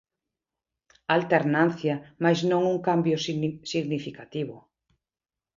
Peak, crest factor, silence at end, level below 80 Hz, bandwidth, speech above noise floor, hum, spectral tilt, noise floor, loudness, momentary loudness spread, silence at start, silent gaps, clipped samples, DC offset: -6 dBFS; 22 dB; 0.95 s; -68 dBFS; 7.6 kHz; over 65 dB; none; -6 dB/octave; under -90 dBFS; -26 LUFS; 11 LU; 1.1 s; none; under 0.1%; under 0.1%